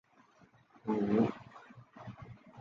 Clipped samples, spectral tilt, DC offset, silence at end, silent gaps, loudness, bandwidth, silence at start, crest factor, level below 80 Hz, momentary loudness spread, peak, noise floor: under 0.1%; -9 dB/octave; under 0.1%; 0 s; none; -33 LUFS; 7 kHz; 0.85 s; 20 dB; -68 dBFS; 24 LU; -18 dBFS; -65 dBFS